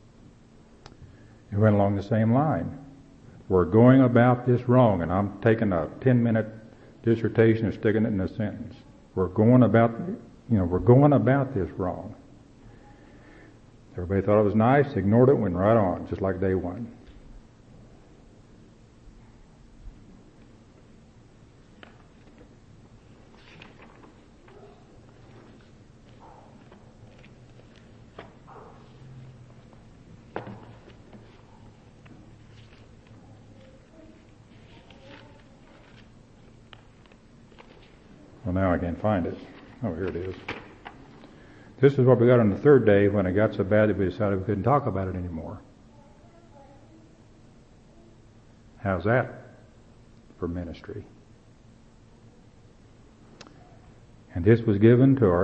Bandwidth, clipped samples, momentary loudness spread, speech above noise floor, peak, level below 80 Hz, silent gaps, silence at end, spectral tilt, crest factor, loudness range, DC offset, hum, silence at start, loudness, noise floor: 6.2 kHz; under 0.1%; 21 LU; 31 dB; -4 dBFS; -52 dBFS; none; 0 s; -10 dB/octave; 22 dB; 22 LU; under 0.1%; none; 1 s; -23 LUFS; -53 dBFS